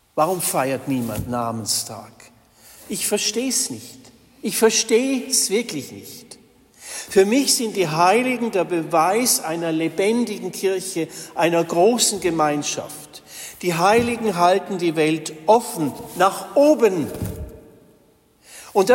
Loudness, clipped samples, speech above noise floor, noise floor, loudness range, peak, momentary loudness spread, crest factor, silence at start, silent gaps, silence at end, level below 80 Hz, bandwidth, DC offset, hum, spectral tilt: -20 LUFS; under 0.1%; 36 dB; -56 dBFS; 5 LU; -4 dBFS; 16 LU; 16 dB; 0.15 s; none; 0 s; -52 dBFS; 16.5 kHz; under 0.1%; none; -3.5 dB/octave